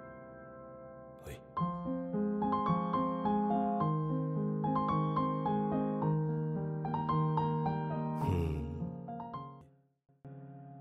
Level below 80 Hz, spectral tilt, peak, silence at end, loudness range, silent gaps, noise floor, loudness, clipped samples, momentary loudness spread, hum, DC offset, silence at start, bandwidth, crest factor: -54 dBFS; -9.5 dB/octave; -18 dBFS; 0 s; 4 LU; none; -61 dBFS; -34 LUFS; under 0.1%; 18 LU; none; under 0.1%; 0 s; 5 kHz; 16 dB